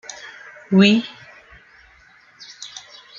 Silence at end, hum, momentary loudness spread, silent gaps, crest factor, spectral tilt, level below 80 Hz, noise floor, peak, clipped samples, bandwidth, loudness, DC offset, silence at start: 0.4 s; none; 27 LU; none; 22 dB; -5.5 dB/octave; -62 dBFS; -51 dBFS; -2 dBFS; under 0.1%; 7.6 kHz; -16 LUFS; under 0.1%; 0.25 s